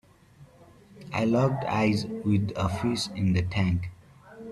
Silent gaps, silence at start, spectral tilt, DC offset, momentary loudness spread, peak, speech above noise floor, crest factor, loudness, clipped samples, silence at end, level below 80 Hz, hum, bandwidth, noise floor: none; 0.4 s; -6.5 dB/octave; under 0.1%; 7 LU; -12 dBFS; 29 dB; 16 dB; -27 LUFS; under 0.1%; 0 s; -52 dBFS; none; 12.5 kHz; -54 dBFS